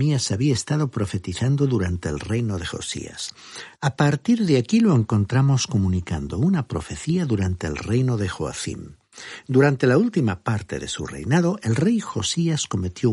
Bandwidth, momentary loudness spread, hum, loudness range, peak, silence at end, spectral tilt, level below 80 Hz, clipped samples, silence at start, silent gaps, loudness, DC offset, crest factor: 11.5 kHz; 11 LU; none; 4 LU; -4 dBFS; 0 s; -6 dB/octave; -46 dBFS; under 0.1%; 0 s; none; -22 LUFS; under 0.1%; 16 dB